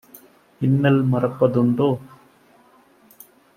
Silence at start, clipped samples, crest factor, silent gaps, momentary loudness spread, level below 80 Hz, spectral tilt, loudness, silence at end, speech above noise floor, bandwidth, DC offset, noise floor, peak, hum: 0.6 s; under 0.1%; 18 dB; none; 6 LU; -60 dBFS; -9 dB/octave; -20 LUFS; 1.5 s; 36 dB; 15.5 kHz; under 0.1%; -54 dBFS; -4 dBFS; none